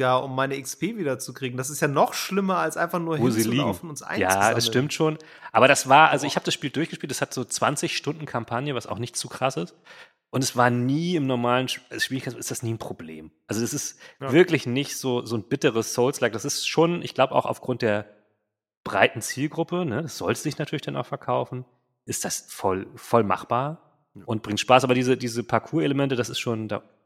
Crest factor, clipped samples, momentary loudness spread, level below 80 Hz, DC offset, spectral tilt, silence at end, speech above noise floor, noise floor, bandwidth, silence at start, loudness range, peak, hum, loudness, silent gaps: 24 dB; under 0.1%; 12 LU; -66 dBFS; under 0.1%; -4.5 dB/octave; 0.25 s; 51 dB; -76 dBFS; 16.5 kHz; 0 s; 7 LU; 0 dBFS; none; -24 LUFS; 18.77-18.84 s